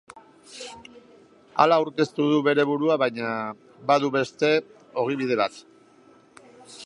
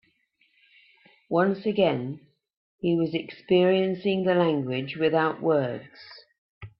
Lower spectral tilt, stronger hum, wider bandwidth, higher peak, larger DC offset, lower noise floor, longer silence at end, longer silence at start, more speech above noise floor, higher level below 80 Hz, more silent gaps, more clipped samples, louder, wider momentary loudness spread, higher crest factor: second, -5.5 dB/octave vs -10 dB/octave; neither; first, 11 kHz vs 5.6 kHz; first, -2 dBFS vs -10 dBFS; neither; second, -55 dBFS vs -68 dBFS; about the same, 0 s vs 0.1 s; second, 0.15 s vs 1.3 s; second, 32 dB vs 43 dB; about the same, -72 dBFS vs -68 dBFS; second, none vs 2.57-2.78 s, 6.38-6.61 s; neither; about the same, -23 LUFS vs -25 LUFS; first, 19 LU vs 15 LU; first, 24 dB vs 18 dB